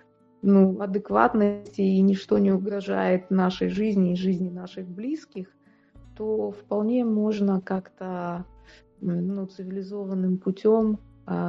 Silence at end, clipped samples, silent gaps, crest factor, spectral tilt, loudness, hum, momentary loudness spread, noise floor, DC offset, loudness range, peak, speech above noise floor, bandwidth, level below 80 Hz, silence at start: 0 s; under 0.1%; none; 20 dB; -9 dB/octave; -25 LUFS; none; 13 LU; -53 dBFS; under 0.1%; 6 LU; -4 dBFS; 29 dB; 6.8 kHz; -58 dBFS; 0.45 s